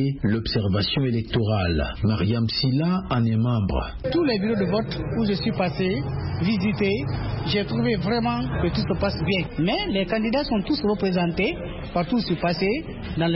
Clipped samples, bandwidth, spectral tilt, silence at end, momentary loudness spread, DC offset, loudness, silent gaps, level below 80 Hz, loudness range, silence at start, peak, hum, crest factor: under 0.1%; 5.8 kHz; -11 dB/octave; 0 s; 4 LU; under 0.1%; -24 LUFS; none; -38 dBFS; 1 LU; 0 s; -10 dBFS; none; 14 dB